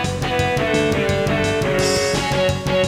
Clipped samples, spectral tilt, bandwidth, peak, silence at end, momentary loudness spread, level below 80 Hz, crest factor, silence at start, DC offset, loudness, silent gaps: under 0.1%; -4.5 dB/octave; 16.5 kHz; -6 dBFS; 0 s; 2 LU; -36 dBFS; 12 dB; 0 s; under 0.1%; -18 LUFS; none